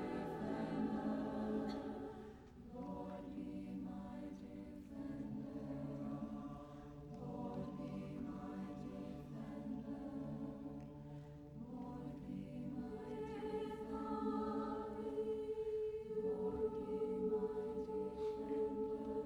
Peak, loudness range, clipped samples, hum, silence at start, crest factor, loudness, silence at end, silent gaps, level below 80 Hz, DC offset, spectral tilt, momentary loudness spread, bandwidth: -30 dBFS; 7 LU; under 0.1%; none; 0 s; 16 dB; -46 LUFS; 0 s; none; -64 dBFS; under 0.1%; -8.5 dB/octave; 11 LU; 17.5 kHz